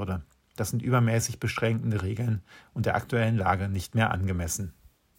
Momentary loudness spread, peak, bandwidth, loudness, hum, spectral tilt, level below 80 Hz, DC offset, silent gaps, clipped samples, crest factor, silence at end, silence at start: 10 LU; -8 dBFS; 16 kHz; -28 LUFS; none; -5.5 dB/octave; -50 dBFS; under 0.1%; none; under 0.1%; 18 dB; 0.45 s; 0 s